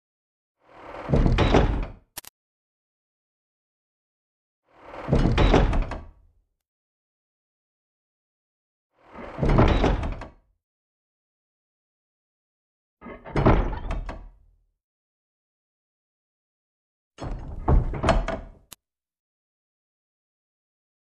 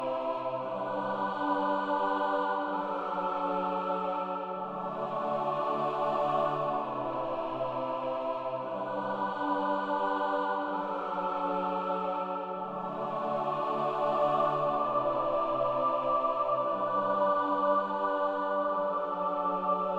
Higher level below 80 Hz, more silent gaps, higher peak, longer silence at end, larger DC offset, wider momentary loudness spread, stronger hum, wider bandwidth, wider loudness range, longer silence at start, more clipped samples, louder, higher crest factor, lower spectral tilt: first, -32 dBFS vs -66 dBFS; first, 2.29-4.63 s, 6.68-8.90 s, 10.63-12.97 s, 14.84-17.11 s vs none; first, -4 dBFS vs -16 dBFS; first, 2.55 s vs 0 s; neither; first, 21 LU vs 6 LU; neither; first, 12 kHz vs 8 kHz; first, 14 LU vs 4 LU; first, 0.8 s vs 0 s; neither; first, -24 LUFS vs -31 LUFS; first, 22 dB vs 14 dB; about the same, -7 dB/octave vs -7 dB/octave